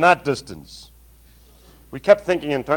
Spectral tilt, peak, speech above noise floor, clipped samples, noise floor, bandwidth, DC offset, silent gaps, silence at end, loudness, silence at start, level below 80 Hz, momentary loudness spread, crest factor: -5 dB/octave; 0 dBFS; 31 dB; under 0.1%; -50 dBFS; 18 kHz; under 0.1%; none; 0 s; -19 LUFS; 0 s; -50 dBFS; 23 LU; 22 dB